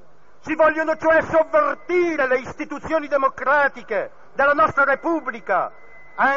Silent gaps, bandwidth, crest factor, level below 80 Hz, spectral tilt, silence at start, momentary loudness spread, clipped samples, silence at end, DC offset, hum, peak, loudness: none; 7.6 kHz; 14 dB; -54 dBFS; -3 dB/octave; 0.45 s; 12 LU; under 0.1%; 0 s; 1%; none; -6 dBFS; -20 LUFS